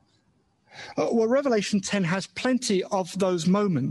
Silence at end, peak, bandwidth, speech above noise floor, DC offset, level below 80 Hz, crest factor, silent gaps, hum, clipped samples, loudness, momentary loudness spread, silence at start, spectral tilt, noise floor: 0 s; -10 dBFS; 12 kHz; 43 dB; under 0.1%; -66 dBFS; 14 dB; none; none; under 0.1%; -25 LUFS; 6 LU; 0.75 s; -5.5 dB/octave; -67 dBFS